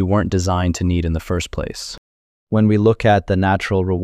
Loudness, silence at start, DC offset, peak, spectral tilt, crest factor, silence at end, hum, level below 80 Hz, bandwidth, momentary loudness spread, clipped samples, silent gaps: -18 LUFS; 0 s; under 0.1%; -4 dBFS; -6.5 dB/octave; 14 dB; 0 s; none; -34 dBFS; 13 kHz; 12 LU; under 0.1%; 1.98-2.47 s